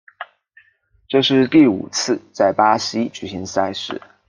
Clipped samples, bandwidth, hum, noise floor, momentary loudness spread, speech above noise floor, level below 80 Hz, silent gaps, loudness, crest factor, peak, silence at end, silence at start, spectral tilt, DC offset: under 0.1%; 10 kHz; none; -58 dBFS; 15 LU; 40 dB; -60 dBFS; none; -18 LUFS; 18 dB; -2 dBFS; 0.3 s; 0.2 s; -4.5 dB/octave; under 0.1%